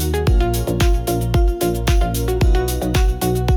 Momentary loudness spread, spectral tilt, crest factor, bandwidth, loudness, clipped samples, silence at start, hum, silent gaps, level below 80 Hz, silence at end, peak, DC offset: 2 LU; -6 dB/octave; 10 dB; 19.5 kHz; -18 LUFS; under 0.1%; 0 s; none; none; -18 dBFS; 0 s; -6 dBFS; under 0.1%